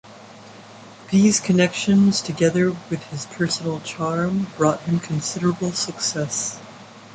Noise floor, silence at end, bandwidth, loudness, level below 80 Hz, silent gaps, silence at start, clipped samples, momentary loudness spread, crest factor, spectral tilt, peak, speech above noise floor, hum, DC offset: -42 dBFS; 0 s; 9.4 kHz; -21 LUFS; -58 dBFS; none; 0.05 s; under 0.1%; 12 LU; 16 dB; -4.5 dB/octave; -4 dBFS; 22 dB; none; under 0.1%